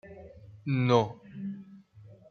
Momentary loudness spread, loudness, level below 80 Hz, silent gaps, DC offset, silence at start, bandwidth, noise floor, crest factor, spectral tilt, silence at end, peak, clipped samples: 24 LU; -30 LUFS; -66 dBFS; none; under 0.1%; 0.05 s; 6.6 kHz; -54 dBFS; 24 dB; -7.5 dB/octave; 0.15 s; -8 dBFS; under 0.1%